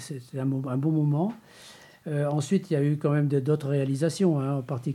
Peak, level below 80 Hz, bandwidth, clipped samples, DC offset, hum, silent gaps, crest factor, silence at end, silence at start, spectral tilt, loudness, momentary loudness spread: -12 dBFS; -74 dBFS; 12.5 kHz; under 0.1%; under 0.1%; none; none; 14 dB; 0 s; 0 s; -7.5 dB/octave; -27 LUFS; 7 LU